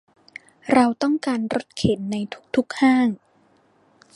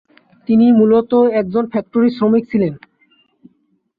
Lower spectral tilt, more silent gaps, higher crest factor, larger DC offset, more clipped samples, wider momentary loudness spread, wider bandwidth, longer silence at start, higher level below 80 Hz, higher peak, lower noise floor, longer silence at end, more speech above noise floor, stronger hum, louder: second, -6 dB/octave vs -11 dB/octave; neither; first, 20 dB vs 12 dB; neither; neither; first, 20 LU vs 8 LU; first, 11.5 kHz vs 5 kHz; first, 0.65 s vs 0.5 s; about the same, -52 dBFS vs -56 dBFS; about the same, -2 dBFS vs -2 dBFS; about the same, -59 dBFS vs -62 dBFS; second, 1 s vs 1.2 s; second, 39 dB vs 49 dB; neither; second, -21 LUFS vs -14 LUFS